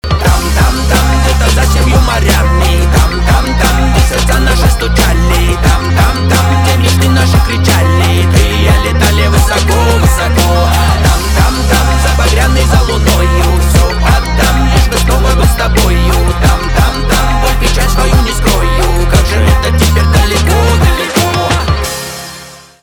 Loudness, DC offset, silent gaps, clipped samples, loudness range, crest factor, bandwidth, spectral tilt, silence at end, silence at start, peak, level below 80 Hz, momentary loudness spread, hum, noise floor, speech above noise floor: -10 LUFS; under 0.1%; none; under 0.1%; 1 LU; 8 dB; 18.5 kHz; -5 dB/octave; 0.25 s; 0.05 s; 0 dBFS; -10 dBFS; 2 LU; none; -31 dBFS; 23 dB